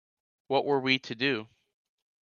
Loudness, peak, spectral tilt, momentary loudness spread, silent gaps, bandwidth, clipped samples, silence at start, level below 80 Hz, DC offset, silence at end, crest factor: -28 LUFS; -10 dBFS; -5.5 dB/octave; 4 LU; none; 7.2 kHz; under 0.1%; 0.5 s; -76 dBFS; under 0.1%; 0.75 s; 22 dB